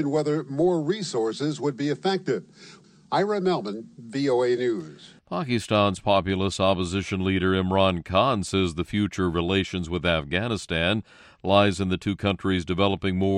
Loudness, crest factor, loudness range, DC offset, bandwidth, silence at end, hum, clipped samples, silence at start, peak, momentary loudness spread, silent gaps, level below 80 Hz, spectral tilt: -25 LUFS; 20 dB; 4 LU; under 0.1%; 11 kHz; 0 s; none; under 0.1%; 0 s; -4 dBFS; 6 LU; none; -50 dBFS; -6 dB/octave